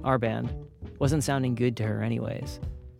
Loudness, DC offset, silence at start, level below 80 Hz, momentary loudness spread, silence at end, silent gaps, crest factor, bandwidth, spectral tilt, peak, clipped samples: -29 LUFS; under 0.1%; 0 s; -44 dBFS; 12 LU; 0 s; none; 20 dB; 15.5 kHz; -6.5 dB/octave; -8 dBFS; under 0.1%